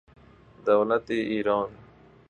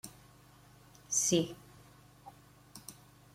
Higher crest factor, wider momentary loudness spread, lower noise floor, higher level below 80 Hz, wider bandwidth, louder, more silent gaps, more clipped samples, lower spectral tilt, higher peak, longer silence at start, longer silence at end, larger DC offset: about the same, 20 dB vs 24 dB; second, 9 LU vs 27 LU; second, -53 dBFS vs -60 dBFS; first, -60 dBFS vs -70 dBFS; second, 8 kHz vs 16.5 kHz; first, -26 LUFS vs -31 LUFS; neither; neither; first, -7 dB/octave vs -3.5 dB/octave; first, -8 dBFS vs -16 dBFS; first, 0.65 s vs 0.05 s; about the same, 0.5 s vs 0.45 s; neither